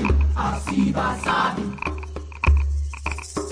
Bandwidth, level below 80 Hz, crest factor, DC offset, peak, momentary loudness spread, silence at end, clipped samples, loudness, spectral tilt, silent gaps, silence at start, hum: 10.5 kHz; -24 dBFS; 14 dB; under 0.1%; -8 dBFS; 9 LU; 0 s; under 0.1%; -23 LUFS; -6 dB/octave; none; 0 s; none